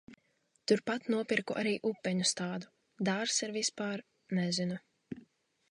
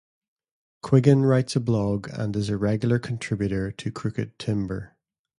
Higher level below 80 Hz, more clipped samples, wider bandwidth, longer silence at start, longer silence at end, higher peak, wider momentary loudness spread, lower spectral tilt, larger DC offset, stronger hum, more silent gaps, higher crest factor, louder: second, -78 dBFS vs -50 dBFS; neither; about the same, 11 kHz vs 11.5 kHz; second, 0.1 s vs 0.85 s; about the same, 0.5 s vs 0.55 s; second, -14 dBFS vs -4 dBFS; first, 15 LU vs 12 LU; second, -3.5 dB/octave vs -7.5 dB/octave; neither; neither; neither; about the same, 22 dB vs 20 dB; second, -34 LUFS vs -24 LUFS